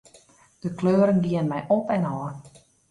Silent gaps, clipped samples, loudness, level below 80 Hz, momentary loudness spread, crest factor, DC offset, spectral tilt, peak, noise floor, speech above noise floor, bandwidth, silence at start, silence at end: none; under 0.1%; -24 LUFS; -60 dBFS; 15 LU; 16 dB; under 0.1%; -8.5 dB/octave; -10 dBFS; -55 dBFS; 33 dB; 11 kHz; 0.65 s; 0.4 s